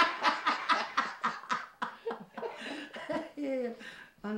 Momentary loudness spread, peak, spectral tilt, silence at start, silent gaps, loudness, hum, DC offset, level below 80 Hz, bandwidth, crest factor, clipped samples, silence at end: 13 LU; -14 dBFS; -3 dB/octave; 0 s; none; -34 LUFS; none; under 0.1%; -76 dBFS; 16 kHz; 20 dB; under 0.1%; 0 s